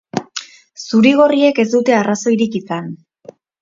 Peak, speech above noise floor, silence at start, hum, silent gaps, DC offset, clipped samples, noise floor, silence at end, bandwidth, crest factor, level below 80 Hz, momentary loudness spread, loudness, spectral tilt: 0 dBFS; 28 dB; 0.15 s; none; none; under 0.1%; under 0.1%; -42 dBFS; 0.65 s; 7.6 kHz; 16 dB; -62 dBFS; 18 LU; -14 LUFS; -5 dB/octave